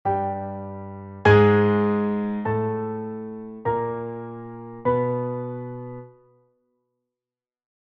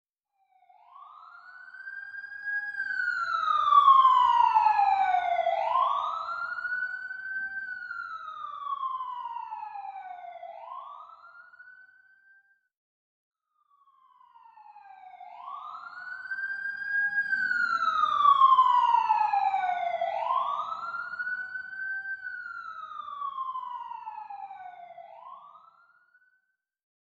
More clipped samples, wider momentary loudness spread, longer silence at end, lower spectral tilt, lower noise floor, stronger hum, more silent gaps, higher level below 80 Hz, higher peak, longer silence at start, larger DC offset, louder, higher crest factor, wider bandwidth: neither; second, 19 LU vs 22 LU; about the same, 1.75 s vs 1.7 s; first, -9 dB/octave vs -1.5 dB/octave; first, under -90 dBFS vs -76 dBFS; neither; second, none vs 12.77-13.31 s; first, -54 dBFS vs -78 dBFS; first, -4 dBFS vs -8 dBFS; second, 0.05 s vs 0.95 s; neither; first, -23 LUFS vs -26 LUFS; about the same, 22 dB vs 20 dB; about the same, 7.4 kHz vs 7.8 kHz